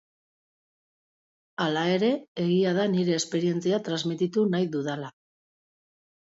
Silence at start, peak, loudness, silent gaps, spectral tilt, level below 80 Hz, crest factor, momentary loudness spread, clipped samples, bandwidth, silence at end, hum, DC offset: 1.6 s; -14 dBFS; -26 LUFS; 2.28-2.35 s; -5.5 dB/octave; -74 dBFS; 14 dB; 7 LU; under 0.1%; 8 kHz; 1.2 s; none; under 0.1%